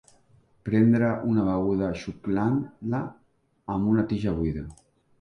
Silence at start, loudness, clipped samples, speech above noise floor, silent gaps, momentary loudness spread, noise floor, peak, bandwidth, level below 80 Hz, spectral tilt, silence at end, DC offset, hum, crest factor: 0.65 s; -26 LUFS; under 0.1%; 36 dB; none; 15 LU; -61 dBFS; -10 dBFS; 9.8 kHz; -48 dBFS; -9 dB/octave; 0.45 s; under 0.1%; none; 18 dB